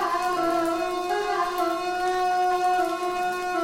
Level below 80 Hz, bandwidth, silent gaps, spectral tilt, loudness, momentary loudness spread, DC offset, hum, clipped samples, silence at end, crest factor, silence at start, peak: -56 dBFS; 17 kHz; none; -3 dB/octave; -25 LUFS; 4 LU; under 0.1%; none; under 0.1%; 0 s; 12 dB; 0 s; -12 dBFS